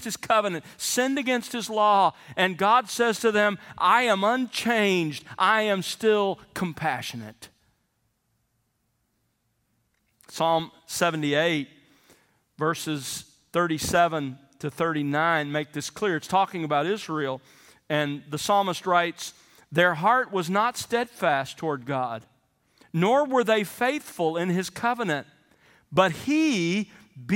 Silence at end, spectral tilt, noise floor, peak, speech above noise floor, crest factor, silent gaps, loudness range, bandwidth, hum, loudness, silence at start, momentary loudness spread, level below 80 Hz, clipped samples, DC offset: 0 s; -4 dB/octave; -73 dBFS; -4 dBFS; 49 dB; 22 dB; none; 6 LU; 17 kHz; none; -25 LUFS; 0 s; 11 LU; -66 dBFS; under 0.1%; under 0.1%